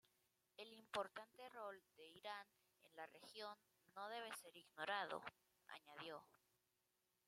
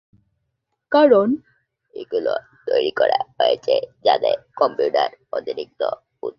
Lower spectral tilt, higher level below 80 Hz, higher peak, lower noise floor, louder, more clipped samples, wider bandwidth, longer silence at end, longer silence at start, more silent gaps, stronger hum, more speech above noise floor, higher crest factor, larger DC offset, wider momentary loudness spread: second, -2 dB/octave vs -6 dB/octave; second, under -90 dBFS vs -66 dBFS; second, -32 dBFS vs -2 dBFS; first, -88 dBFS vs -75 dBFS; second, -54 LUFS vs -20 LUFS; neither; first, 16 kHz vs 7 kHz; first, 0.95 s vs 0.05 s; second, 0.6 s vs 0.9 s; neither; neither; second, 34 dB vs 56 dB; first, 24 dB vs 18 dB; neither; first, 15 LU vs 12 LU